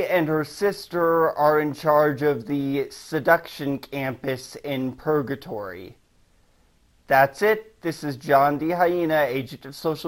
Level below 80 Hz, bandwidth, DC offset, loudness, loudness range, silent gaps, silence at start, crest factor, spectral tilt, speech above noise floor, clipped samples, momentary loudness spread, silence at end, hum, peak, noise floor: -58 dBFS; 16.5 kHz; under 0.1%; -23 LUFS; 7 LU; none; 0 s; 20 dB; -6 dB/octave; 37 dB; under 0.1%; 11 LU; 0 s; none; -2 dBFS; -60 dBFS